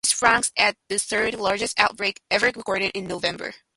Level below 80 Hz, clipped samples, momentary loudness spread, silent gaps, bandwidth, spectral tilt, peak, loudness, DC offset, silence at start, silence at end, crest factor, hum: -56 dBFS; under 0.1%; 8 LU; none; 12 kHz; -1 dB/octave; 0 dBFS; -22 LUFS; under 0.1%; 0.05 s; 0.2 s; 22 dB; none